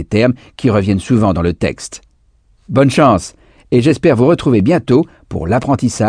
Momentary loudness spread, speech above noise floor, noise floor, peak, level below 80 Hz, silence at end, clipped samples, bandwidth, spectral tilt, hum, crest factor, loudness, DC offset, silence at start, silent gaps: 9 LU; 40 dB; -53 dBFS; 0 dBFS; -38 dBFS; 0 s; under 0.1%; 10 kHz; -7 dB/octave; none; 14 dB; -13 LUFS; under 0.1%; 0 s; none